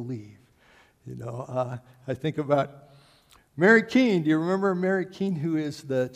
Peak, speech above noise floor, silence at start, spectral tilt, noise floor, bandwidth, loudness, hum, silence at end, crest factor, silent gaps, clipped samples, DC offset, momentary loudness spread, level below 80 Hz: -6 dBFS; 34 dB; 0 s; -7 dB/octave; -59 dBFS; 14 kHz; -25 LUFS; none; 0 s; 22 dB; none; under 0.1%; under 0.1%; 19 LU; -68 dBFS